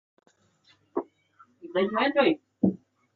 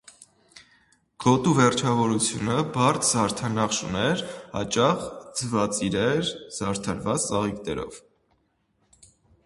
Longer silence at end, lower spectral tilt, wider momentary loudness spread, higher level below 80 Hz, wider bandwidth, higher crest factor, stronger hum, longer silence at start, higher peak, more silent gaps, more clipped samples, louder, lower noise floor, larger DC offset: second, 0.4 s vs 1.45 s; first, -8.5 dB/octave vs -4.5 dB/octave; first, 23 LU vs 11 LU; second, -68 dBFS vs -54 dBFS; second, 4.8 kHz vs 11.5 kHz; about the same, 20 dB vs 22 dB; neither; first, 0.95 s vs 0.55 s; second, -10 dBFS vs -4 dBFS; neither; neither; second, -27 LUFS vs -24 LUFS; second, -64 dBFS vs -69 dBFS; neither